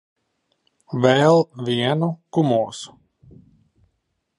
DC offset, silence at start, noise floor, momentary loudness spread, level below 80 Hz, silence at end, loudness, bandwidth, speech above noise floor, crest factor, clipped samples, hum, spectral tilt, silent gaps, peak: under 0.1%; 0.9 s; -73 dBFS; 15 LU; -64 dBFS; 1.55 s; -19 LUFS; 11 kHz; 54 dB; 20 dB; under 0.1%; none; -6.5 dB/octave; none; -2 dBFS